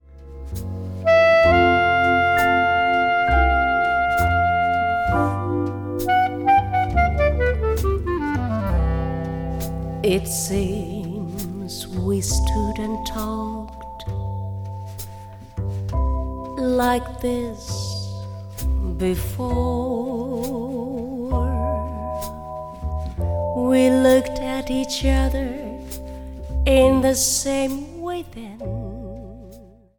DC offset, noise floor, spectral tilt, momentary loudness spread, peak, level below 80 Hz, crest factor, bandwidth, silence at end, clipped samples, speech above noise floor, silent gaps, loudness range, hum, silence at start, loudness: under 0.1%; -45 dBFS; -5 dB/octave; 16 LU; -4 dBFS; -30 dBFS; 18 dB; 19 kHz; 0.3 s; under 0.1%; 26 dB; none; 9 LU; none; 0.1 s; -21 LUFS